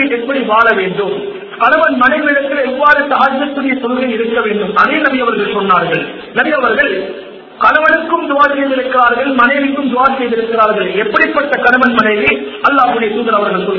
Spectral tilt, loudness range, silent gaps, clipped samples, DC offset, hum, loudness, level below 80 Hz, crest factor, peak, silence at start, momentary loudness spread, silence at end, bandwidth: -6.5 dB/octave; 2 LU; none; 0.3%; under 0.1%; none; -11 LUFS; -48 dBFS; 12 dB; 0 dBFS; 0 s; 6 LU; 0 s; 6 kHz